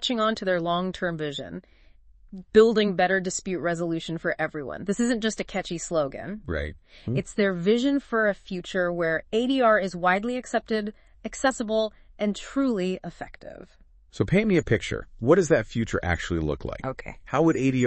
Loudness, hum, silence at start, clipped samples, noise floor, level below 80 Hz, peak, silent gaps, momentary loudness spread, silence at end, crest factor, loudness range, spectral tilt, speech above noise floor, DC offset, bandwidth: -25 LUFS; none; 0 s; under 0.1%; -53 dBFS; -48 dBFS; -6 dBFS; none; 14 LU; 0 s; 20 dB; 4 LU; -5.5 dB/octave; 27 dB; under 0.1%; 8.8 kHz